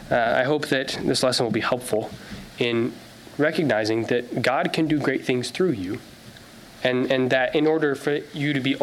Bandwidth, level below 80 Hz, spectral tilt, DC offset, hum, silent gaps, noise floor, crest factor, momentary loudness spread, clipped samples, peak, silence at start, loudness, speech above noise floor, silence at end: 15.5 kHz; -56 dBFS; -5 dB/octave; under 0.1%; none; none; -45 dBFS; 16 dB; 11 LU; under 0.1%; -6 dBFS; 0 s; -23 LUFS; 22 dB; 0 s